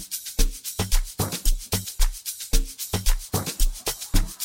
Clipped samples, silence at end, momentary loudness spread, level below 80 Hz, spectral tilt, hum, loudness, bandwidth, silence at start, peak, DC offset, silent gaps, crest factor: under 0.1%; 0 s; 3 LU; -24 dBFS; -3 dB/octave; none; -27 LUFS; 17 kHz; 0 s; -6 dBFS; under 0.1%; none; 18 dB